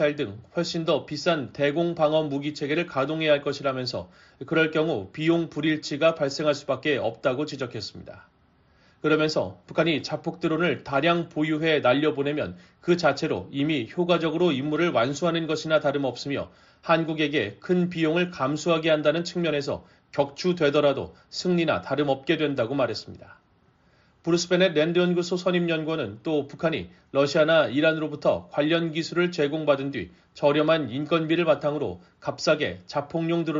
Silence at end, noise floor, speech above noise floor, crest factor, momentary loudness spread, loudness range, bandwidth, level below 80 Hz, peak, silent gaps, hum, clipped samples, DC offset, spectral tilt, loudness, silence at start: 0 s; -62 dBFS; 37 dB; 18 dB; 9 LU; 3 LU; 7.6 kHz; -62 dBFS; -8 dBFS; none; none; under 0.1%; under 0.1%; -4.5 dB/octave; -25 LUFS; 0 s